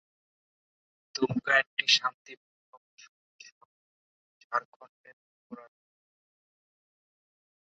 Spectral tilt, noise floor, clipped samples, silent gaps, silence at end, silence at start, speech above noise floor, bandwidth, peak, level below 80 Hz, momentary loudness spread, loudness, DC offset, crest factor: -0.5 dB/octave; under -90 dBFS; under 0.1%; 1.67-1.77 s, 2.14-2.25 s, 2.37-2.97 s, 3.09-3.39 s, 3.52-4.50 s, 4.65-4.80 s, 4.89-5.04 s, 5.13-5.50 s; 2.15 s; 1.15 s; over 62 dB; 7.4 kHz; -8 dBFS; -78 dBFS; 26 LU; -27 LUFS; under 0.1%; 28 dB